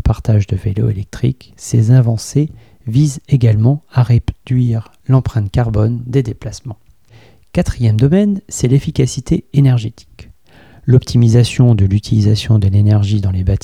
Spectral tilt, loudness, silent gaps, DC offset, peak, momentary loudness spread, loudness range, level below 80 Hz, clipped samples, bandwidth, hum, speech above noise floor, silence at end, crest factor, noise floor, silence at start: -7.5 dB/octave; -14 LUFS; none; 0.4%; 0 dBFS; 8 LU; 4 LU; -32 dBFS; under 0.1%; 11.5 kHz; none; 33 dB; 0.05 s; 14 dB; -45 dBFS; 0.05 s